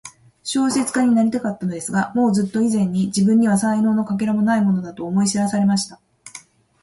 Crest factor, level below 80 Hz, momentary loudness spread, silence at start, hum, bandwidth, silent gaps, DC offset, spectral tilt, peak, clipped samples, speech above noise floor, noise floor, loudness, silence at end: 12 dB; -58 dBFS; 8 LU; 0.05 s; none; 11.5 kHz; none; under 0.1%; -5.5 dB/octave; -6 dBFS; under 0.1%; 26 dB; -44 dBFS; -19 LUFS; 0.45 s